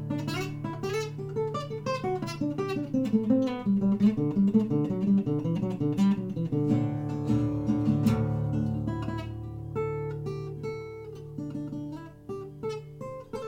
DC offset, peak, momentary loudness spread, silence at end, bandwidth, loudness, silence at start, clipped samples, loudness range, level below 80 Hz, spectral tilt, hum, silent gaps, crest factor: under 0.1%; -12 dBFS; 14 LU; 0 s; 13.5 kHz; -29 LUFS; 0 s; under 0.1%; 10 LU; -52 dBFS; -8 dB/octave; none; none; 16 dB